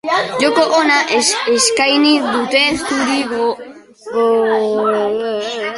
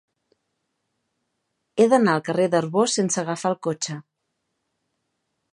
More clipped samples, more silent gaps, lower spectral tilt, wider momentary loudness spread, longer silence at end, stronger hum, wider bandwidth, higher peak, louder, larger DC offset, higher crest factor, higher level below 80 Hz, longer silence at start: neither; neither; second, -2 dB/octave vs -4.5 dB/octave; second, 8 LU vs 12 LU; second, 0 s vs 1.55 s; neither; about the same, 11.5 kHz vs 11.5 kHz; first, 0 dBFS vs -4 dBFS; first, -14 LUFS vs -22 LUFS; neither; second, 14 dB vs 20 dB; first, -54 dBFS vs -76 dBFS; second, 0.05 s vs 1.75 s